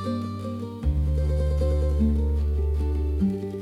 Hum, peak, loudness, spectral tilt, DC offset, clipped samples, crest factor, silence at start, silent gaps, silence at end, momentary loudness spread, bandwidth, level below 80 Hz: none; -12 dBFS; -26 LUFS; -9 dB/octave; under 0.1%; under 0.1%; 12 dB; 0 s; none; 0 s; 7 LU; 5.2 kHz; -26 dBFS